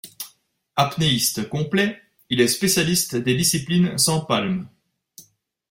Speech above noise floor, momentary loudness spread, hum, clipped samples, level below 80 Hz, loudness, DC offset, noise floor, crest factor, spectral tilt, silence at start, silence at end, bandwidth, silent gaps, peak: 37 dB; 10 LU; none; under 0.1%; -54 dBFS; -20 LUFS; under 0.1%; -57 dBFS; 18 dB; -3.5 dB/octave; 0.05 s; 0.5 s; 16.5 kHz; none; -4 dBFS